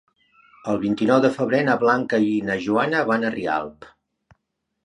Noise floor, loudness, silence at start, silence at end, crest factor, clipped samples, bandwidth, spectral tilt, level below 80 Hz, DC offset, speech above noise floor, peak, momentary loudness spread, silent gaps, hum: -76 dBFS; -21 LUFS; 0.65 s; 1 s; 20 dB; under 0.1%; 11 kHz; -6.5 dB/octave; -60 dBFS; under 0.1%; 56 dB; -2 dBFS; 8 LU; none; none